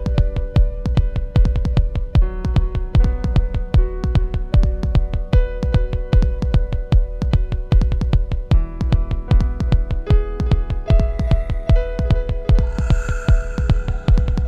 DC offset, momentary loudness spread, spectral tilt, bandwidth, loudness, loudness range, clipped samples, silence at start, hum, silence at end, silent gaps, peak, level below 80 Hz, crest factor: under 0.1%; 2 LU; -8 dB/octave; 7.6 kHz; -20 LUFS; 1 LU; under 0.1%; 0 s; none; 0 s; none; 0 dBFS; -18 dBFS; 16 dB